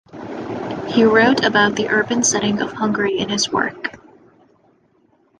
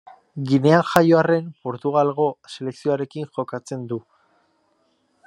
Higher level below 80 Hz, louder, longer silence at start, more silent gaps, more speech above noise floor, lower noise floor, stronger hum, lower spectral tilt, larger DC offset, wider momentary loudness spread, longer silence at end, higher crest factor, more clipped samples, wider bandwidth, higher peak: first, -54 dBFS vs -66 dBFS; first, -17 LUFS vs -21 LUFS; second, 0.15 s vs 0.35 s; neither; second, 41 dB vs 45 dB; second, -58 dBFS vs -66 dBFS; neither; second, -3 dB/octave vs -7 dB/octave; neither; about the same, 15 LU vs 16 LU; first, 1.45 s vs 1.25 s; about the same, 18 dB vs 22 dB; neither; second, 10.5 kHz vs 12.5 kHz; about the same, -2 dBFS vs 0 dBFS